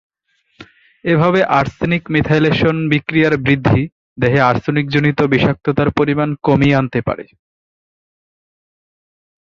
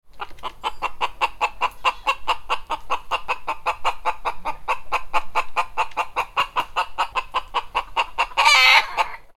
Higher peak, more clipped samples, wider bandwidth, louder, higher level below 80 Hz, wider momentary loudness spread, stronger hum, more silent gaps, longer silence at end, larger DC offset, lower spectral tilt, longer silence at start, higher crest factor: about the same, 0 dBFS vs 0 dBFS; neither; second, 7.2 kHz vs 16.5 kHz; first, -15 LUFS vs -22 LUFS; about the same, -42 dBFS vs -44 dBFS; second, 6 LU vs 13 LU; neither; first, 3.92-4.16 s vs none; first, 2.2 s vs 0.05 s; neither; first, -8 dB/octave vs 0 dB/octave; first, 0.6 s vs 0.05 s; second, 16 dB vs 22 dB